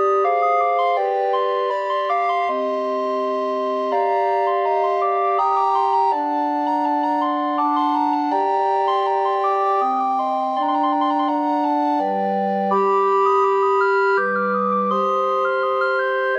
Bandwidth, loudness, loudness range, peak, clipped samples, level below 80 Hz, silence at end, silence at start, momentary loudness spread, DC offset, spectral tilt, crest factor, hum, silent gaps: 7.4 kHz; -19 LUFS; 2 LU; -8 dBFS; under 0.1%; -76 dBFS; 0 s; 0 s; 4 LU; under 0.1%; -6.5 dB/octave; 12 dB; none; none